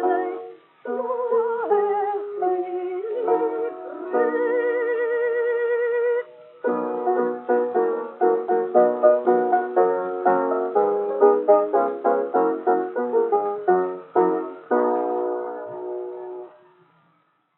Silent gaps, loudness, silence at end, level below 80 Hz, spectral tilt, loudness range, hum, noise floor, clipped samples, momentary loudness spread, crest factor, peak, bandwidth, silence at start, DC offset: none; -22 LUFS; 1.1 s; under -90 dBFS; -5.5 dB/octave; 5 LU; none; -65 dBFS; under 0.1%; 12 LU; 18 dB; -4 dBFS; 3.8 kHz; 0 s; under 0.1%